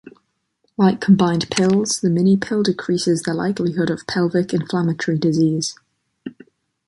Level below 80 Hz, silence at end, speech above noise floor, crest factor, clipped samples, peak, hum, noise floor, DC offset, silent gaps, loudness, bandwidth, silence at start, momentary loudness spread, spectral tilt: -56 dBFS; 0.55 s; 50 dB; 18 dB; under 0.1%; -2 dBFS; none; -68 dBFS; under 0.1%; none; -19 LUFS; 11.5 kHz; 0.05 s; 10 LU; -5.5 dB/octave